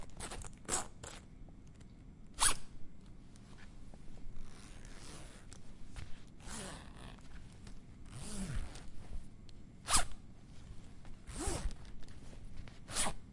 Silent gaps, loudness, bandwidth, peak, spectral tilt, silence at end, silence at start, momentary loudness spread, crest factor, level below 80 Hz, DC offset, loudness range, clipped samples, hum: none; -39 LUFS; 11.5 kHz; -14 dBFS; -2 dB/octave; 0 s; 0 s; 25 LU; 26 dB; -48 dBFS; under 0.1%; 13 LU; under 0.1%; none